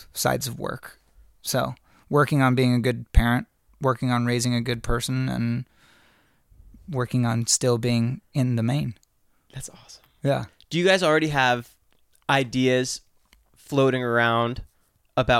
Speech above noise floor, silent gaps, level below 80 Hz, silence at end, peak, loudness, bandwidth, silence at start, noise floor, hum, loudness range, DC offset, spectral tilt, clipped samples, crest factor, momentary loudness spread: 39 dB; none; -38 dBFS; 0 s; -4 dBFS; -24 LUFS; 16 kHz; 0 s; -62 dBFS; none; 4 LU; under 0.1%; -5 dB/octave; under 0.1%; 20 dB; 14 LU